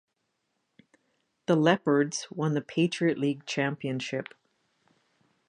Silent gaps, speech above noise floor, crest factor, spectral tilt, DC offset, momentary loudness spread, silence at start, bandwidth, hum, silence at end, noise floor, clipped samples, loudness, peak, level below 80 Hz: none; 51 dB; 22 dB; -5.5 dB/octave; under 0.1%; 11 LU; 1.5 s; 10.5 kHz; none; 1.25 s; -79 dBFS; under 0.1%; -28 LUFS; -8 dBFS; -78 dBFS